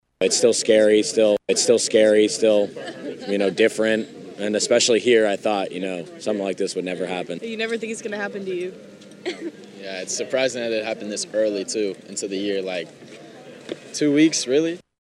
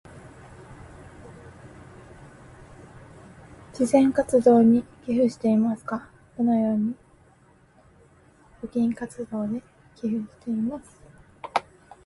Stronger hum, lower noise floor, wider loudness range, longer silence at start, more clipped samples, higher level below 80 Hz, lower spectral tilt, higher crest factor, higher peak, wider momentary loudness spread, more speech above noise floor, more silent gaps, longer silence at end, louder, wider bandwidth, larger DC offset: neither; second, -42 dBFS vs -57 dBFS; about the same, 9 LU vs 10 LU; about the same, 0.2 s vs 0.15 s; neither; second, -74 dBFS vs -58 dBFS; second, -3 dB/octave vs -7 dB/octave; about the same, 18 dB vs 20 dB; about the same, -4 dBFS vs -6 dBFS; second, 16 LU vs 26 LU; second, 21 dB vs 35 dB; neither; second, 0.2 s vs 0.45 s; first, -21 LUFS vs -24 LUFS; about the same, 12.5 kHz vs 11.5 kHz; neither